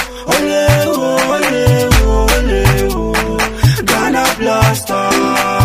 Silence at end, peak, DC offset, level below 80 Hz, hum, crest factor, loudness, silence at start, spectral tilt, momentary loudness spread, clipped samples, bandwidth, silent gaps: 0 s; 0 dBFS; under 0.1%; -20 dBFS; none; 12 dB; -12 LUFS; 0 s; -4.5 dB/octave; 4 LU; under 0.1%; 16 kHz; none